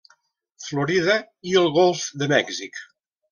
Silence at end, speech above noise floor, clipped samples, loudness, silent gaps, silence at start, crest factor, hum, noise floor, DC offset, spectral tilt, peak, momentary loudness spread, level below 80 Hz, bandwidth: 0.5 s; 41 dB; under 0.1%; -21 LUFS; none; 0.6 s; 20 dB; none; -62 dBFS; under 0.1%; -4 dB/octave; -4 dBFS; 16 LU; -64 dBFS; 10 kHz